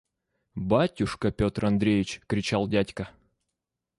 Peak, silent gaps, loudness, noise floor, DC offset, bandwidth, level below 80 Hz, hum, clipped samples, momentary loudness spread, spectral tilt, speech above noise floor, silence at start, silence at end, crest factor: -10 dBFS; none; -27 LUFS; -85 dBFS; under 0.1%; 11.5 kHz; -48 dBFS; none; under 0.1%; 12 LU; -6.5 dB/octave; 59 dB; 0.55 s; 0.9 s; 18 dB